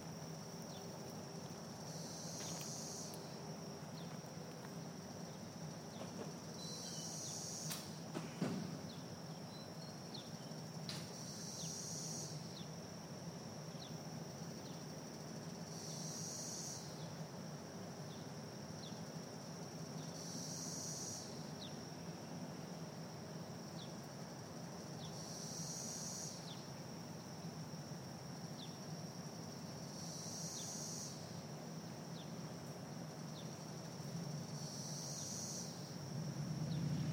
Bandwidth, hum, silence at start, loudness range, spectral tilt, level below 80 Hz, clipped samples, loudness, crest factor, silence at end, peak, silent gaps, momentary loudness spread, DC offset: 16.5 kHz; none; 0 s; 4 LU; -4 dB/octave; -78 dBFS; under 0.1%; -48 LUFS; 20 dB; 0 s; -28 dBFS; none; 6 LU; under 0.1%